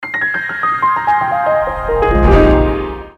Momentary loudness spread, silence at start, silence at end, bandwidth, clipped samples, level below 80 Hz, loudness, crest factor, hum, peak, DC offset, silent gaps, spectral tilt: 7 LU; 0 s; 0.05 s; 6.8 kHz; under 0.1%; -20 dBFS; -13 LUFS; 14 dB; none; 0 dBFS; under 0.1%; none; -8 dB/octave